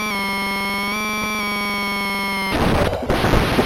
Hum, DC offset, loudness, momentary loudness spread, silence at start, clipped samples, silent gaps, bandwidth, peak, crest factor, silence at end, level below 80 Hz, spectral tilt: none; under 0.1%; -20 LUFS; 3 LU; 0 s; under 0.1%; none; 16.5 kHz; -2 dBFS; 18 dB; 0 s; -30 dBFS; -4.5 dB/octave